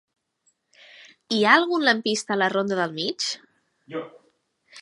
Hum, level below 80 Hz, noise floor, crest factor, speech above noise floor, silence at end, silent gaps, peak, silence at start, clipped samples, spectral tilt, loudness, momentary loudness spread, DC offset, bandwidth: none; -78 dBFS; -70 dBFS; 22 dB; 47 dB; 0 s; none; -2 dBFS; 1 s; under 0.1%; -3 dB/octave; -22 LUFS; 18 LU; under 0.1%; 11.5 kHz